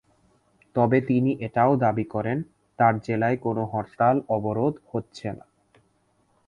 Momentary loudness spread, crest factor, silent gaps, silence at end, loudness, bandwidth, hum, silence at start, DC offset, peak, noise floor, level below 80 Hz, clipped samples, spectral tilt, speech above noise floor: 12 LU; 20 dB; none; 1.1 s; -24 LUFS; 9.6 kHz; none; 0.75 s; under 0.1%; -6 dBFS; -66 dBFS; -58 dBFS; under 0.1%; -9 dB/octave; 43 dB